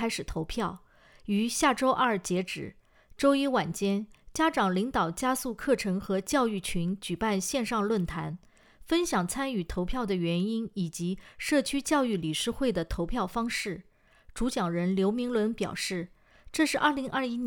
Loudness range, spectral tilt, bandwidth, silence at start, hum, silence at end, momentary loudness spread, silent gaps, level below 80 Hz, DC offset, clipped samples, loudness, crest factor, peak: 3 LU; -4.5 dB/octave; 19.5 kHz; 0 s; none; 0 s; 10 LU; none; -48 dBFS; under 0.1%; under 0.1%; -29 LUFS; 18 dB; -10 dBFS